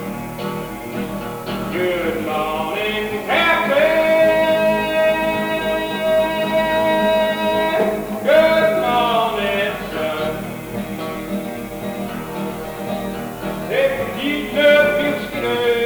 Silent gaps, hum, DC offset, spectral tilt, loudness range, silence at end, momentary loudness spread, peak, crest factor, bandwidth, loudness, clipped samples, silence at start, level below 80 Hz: none; none; under 0.1%; -5 dB/octave; 8 LU; 0 s; 12 LU; -2 dBFS; 16 dB; over 20 kHz; -19 LUFS; under 0.1%; 0 s; -44 dBFS